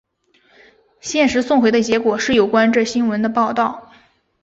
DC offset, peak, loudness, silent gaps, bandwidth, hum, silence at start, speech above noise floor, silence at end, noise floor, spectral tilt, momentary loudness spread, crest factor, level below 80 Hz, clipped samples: under 0.1%; -2 dBFS; -16 LUFS; none; 8 kHz; none; 1.05 s; 42 dB; 0.6 s; -58 dBFS; -4 dB/octave; 8 LU; 16 dB; -52 dBFS; under 0.1%